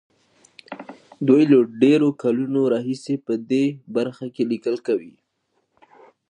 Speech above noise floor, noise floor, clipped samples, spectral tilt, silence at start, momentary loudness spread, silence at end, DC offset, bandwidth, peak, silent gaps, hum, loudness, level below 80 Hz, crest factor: 51 dB; -71 dBFS; under 0.1%; -7.5 dB/octave; 0.7 s; 12 LU; 1.2 s; under 0.1%; 9.8 kHz; -4 dBFS; none; none; -20 LUFS; -76 dBFS; 18 dB